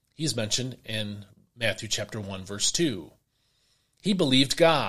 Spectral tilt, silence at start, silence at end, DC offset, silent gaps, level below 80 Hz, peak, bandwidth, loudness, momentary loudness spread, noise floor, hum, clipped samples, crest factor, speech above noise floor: -3.5 dB/octave; 0 s; 0 s; under 0.1%; none; -54 dBFS; -6 dBFS; 15.5 kHz; -27 LUFS; 15 LU; -70 dBFS; none; under 0.1%; 22 dB; 44 dB